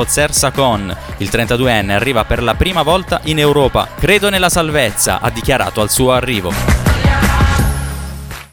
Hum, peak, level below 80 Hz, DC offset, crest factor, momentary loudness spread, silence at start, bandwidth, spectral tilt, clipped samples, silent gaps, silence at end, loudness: none; 0 dBFS; -22 dBFS; under 0.1%; 14 dB; 7 LU; 0 s; 19 kHz; -4 dB/octave; under 0.1%; none; 0.05 s; -13 LUFS